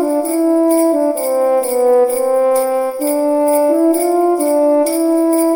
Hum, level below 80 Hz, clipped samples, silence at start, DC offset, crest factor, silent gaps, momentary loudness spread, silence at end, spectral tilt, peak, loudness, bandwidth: none; -64 dBFS; under 0.1%; 0 s; under 0.1%; 10 dB; none; 3 LU; 0 s; -2.5 dB/octave; -4 dBFS; -14 LUFS; 17.5 kHz